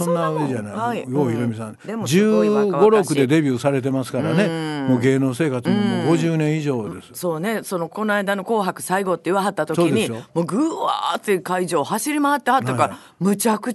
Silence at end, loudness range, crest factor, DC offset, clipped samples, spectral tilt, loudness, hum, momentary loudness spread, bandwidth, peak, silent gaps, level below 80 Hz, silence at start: 0 s; 3 LU; 18 dB; under 0.1%; under 0.1%; -6 dB/octave; -20 LUFS; none; 8 LU; 12.5 kHz; -2 dBFS; none; -64 dBFS; 0 s